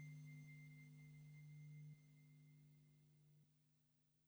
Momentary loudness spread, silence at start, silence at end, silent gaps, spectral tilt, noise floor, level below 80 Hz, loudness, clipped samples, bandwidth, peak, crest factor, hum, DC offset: 9 LU; 0 s; 0 s; none; -6.5 dB/octave; -82 dBFS; under -90 dBFS; -62 LUFS; under 0.1%; over 20 kHz; -50 dBFS; 14 dB; none; under 0.1%